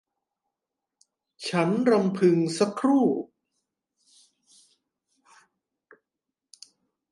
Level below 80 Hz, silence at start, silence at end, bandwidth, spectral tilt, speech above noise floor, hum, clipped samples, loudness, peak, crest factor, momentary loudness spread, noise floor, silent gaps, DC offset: -78 dBFS; 1.4 s; 3.85 s; 11.5 kHz; -6.5 dB/octave; 64 dB; none; under 0.1%; -24 LUFS; -8 dBFS; 20 dB; 10 LU; -87 dBFS; none; under 0.1%